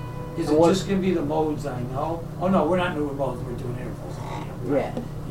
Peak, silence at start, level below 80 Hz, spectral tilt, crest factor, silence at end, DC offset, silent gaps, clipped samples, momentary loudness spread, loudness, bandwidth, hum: -6 dBFS; 0 s; -42 dBFS; -7 dB/octave; 18 dB; 0 s; under 0.1%; none; under 0.1%; 13 LU; -25 LUFS; 16 kHz; none